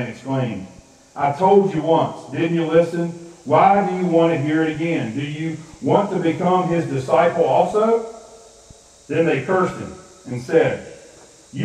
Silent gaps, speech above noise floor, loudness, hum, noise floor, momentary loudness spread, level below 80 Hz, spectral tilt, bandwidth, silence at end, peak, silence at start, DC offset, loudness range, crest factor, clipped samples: none; 28 dB; -19 LUFS; none; -47 dBFS; 15 LU; -56 dBFS; -7 dB/octave; 10.5 kHz; 0 s; 0 dBFS; 0 s; under 0.1%; 4 LU; 18 dB; under 0.1%